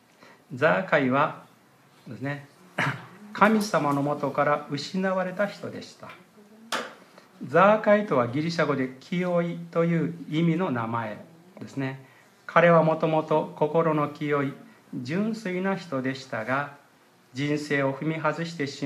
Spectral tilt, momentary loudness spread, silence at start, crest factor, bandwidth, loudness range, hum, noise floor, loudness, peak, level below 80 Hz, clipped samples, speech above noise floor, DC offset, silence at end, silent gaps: -6.5 dB/octave; 18 LU; 0.5 s; 22 dB; 14.5 kHz; 5 LU; none; -58 dBFS; -25 LUFS; -4 dBFS; -76 dBFS; under 0.1%; 33 dB; under 0.1%; 0 s; none